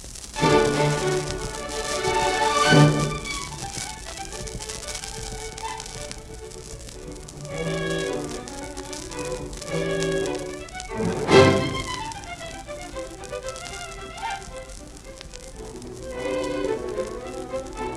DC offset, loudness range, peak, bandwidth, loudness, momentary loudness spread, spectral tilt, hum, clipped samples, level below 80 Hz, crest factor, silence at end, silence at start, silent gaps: under 0.1%; 12 LU; -2 dBFS; 14 kHz; -25 LUFS; 19 LU; -4.5 dB/octave; none; under 0.1%; -42 dBFS; 24 dB; 0 s; 0 s; none